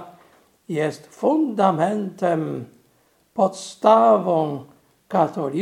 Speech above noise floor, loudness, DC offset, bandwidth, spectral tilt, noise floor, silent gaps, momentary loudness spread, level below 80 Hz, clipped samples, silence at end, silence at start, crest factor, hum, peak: 41 dB; -21 LUFS; under 0.1%; 12.5 kHz; -6.5 dB/octave; -61 dBFS; none; 14 LU; -72 dBFS; under 0.1%; 0 s; 0 s; 20 dB; none; -2 dBFS